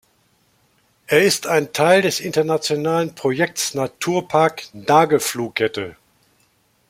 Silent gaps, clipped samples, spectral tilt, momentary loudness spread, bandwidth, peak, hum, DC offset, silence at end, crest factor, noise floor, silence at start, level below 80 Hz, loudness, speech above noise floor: none; under 0.1%; -4 dB/octave; 8 LU; 16.5 kHz; -2 dBFS; none; under 0.1%; 1 s; 18 dB; -61 dBFS; 1.1 s; -62 dBFS; -18 LUFS; 43 dB